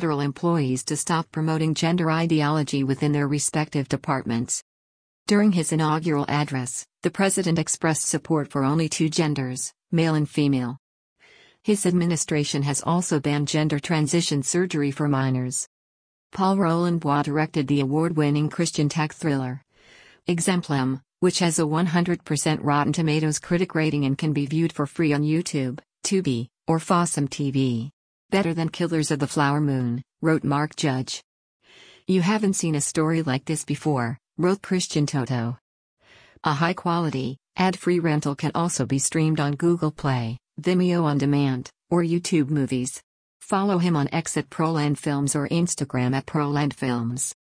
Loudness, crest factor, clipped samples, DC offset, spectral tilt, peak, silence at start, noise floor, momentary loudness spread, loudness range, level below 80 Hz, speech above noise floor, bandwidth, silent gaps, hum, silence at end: -24 LUFS; 16 dB; under 0.1%; under 0.1%; -5.5 dB/octave; -8 dBFS; 0 s; -53 dBFS; 6 LU; 2 LU; -60 dBFS; 30 dB; 10.5 kHz; 4.62-5.26 s, 10.79-11.16 s, 15.67-16.30 s, 27.93-28.29 s, 31.24-31.60 s, 35.61-35.97 s, 43.03-43.40 s; none; 0.25 s